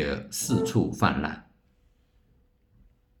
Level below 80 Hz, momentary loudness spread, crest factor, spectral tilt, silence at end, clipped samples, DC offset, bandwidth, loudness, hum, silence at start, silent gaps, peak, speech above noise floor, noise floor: -50 dBFS; 9 LU; 24 dB; -5 dB/octave; 1.8 s; under 0.1%; under 0.1%; 19.5 kHz; -27 LUFS; none; 0 s; none; -6 dBFS; 38 dB; -64 dBFS